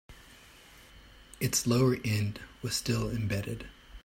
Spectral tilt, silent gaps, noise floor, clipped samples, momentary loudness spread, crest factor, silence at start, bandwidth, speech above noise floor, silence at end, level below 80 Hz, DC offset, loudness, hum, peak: -4.5 dB/octave; none; -55 dBFS; under 0.1%; 14 LU; 18 dB; 0.1 s; 16.5 kHz; 25 dB; 0.05 s; -52 dBFS; under 0.1%; -31 LUFS; none; -14 dBFS